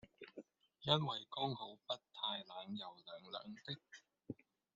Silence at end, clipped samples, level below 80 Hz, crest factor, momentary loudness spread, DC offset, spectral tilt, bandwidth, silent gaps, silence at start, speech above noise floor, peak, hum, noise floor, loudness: 0.4 s; under 0.1%; -82 dBFS; 28 dB; 20 LU; under 0.1%; -3.5 dB/octave; 7.6 kHz; none; 0.05 s; 24 dB; -18 dBFS; none; -65 dBFS; -43 LUFS